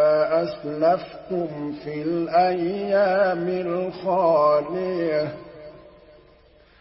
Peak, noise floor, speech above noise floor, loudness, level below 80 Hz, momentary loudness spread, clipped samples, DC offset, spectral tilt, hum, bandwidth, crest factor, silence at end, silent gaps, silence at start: -8 dBFS; -54 dBFS; 32 dB; -23 LUFS; -60 dBFS; 12 LU; under 0.1%; under 0.1%; -11 dB/octave; none; 5.8 kHz; 16 dB; 0.9 s; none; 0 s